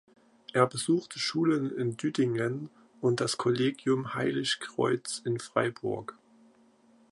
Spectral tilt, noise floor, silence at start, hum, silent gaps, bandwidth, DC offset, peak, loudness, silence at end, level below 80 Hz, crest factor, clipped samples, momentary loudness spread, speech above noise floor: -5 dB/octave; -62 dBFS; 0.55 s; none; none; 11.5 kHz; under 0.1%; -8 dBFS; -30 LUFS; 1 s; -72 dBFS; 22 dB; under 0.1%; 7 LU; 33 dB